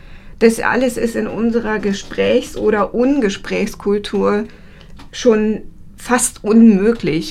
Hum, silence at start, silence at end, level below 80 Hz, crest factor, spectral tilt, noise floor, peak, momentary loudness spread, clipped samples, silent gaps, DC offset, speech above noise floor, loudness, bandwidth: none; 0.05 s; 0 s; -38 dBFS; 16 dB; -5 dB/octave; -36 dBFS; 0 dBFS; 10 LU; under 0.1%; none; under 0.1%; 21 dB; -16 LUFS; 14 kHz